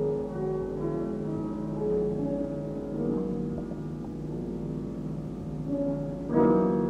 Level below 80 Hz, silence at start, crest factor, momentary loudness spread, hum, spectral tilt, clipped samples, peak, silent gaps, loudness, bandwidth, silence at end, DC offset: -48 dBFS; 0 s; 18 dB; 10 LU; none; -10 dB/octave; under 0.1%; -12 dBFS; none; -31 LUFS; 9.2 kHz; 0 s; under 0.1%